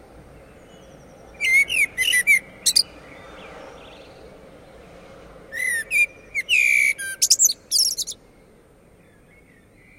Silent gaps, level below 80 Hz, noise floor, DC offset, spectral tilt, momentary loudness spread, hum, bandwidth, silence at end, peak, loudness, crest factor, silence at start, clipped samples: none; -56 dBFS; -52 dBFS; under 0.1%; 2 dB/octave; 22 LU; none; 16 kHz; 1.85 s; -2 dBFS; -18 LUFS; 22 dB; 1.4 s; under 0.1%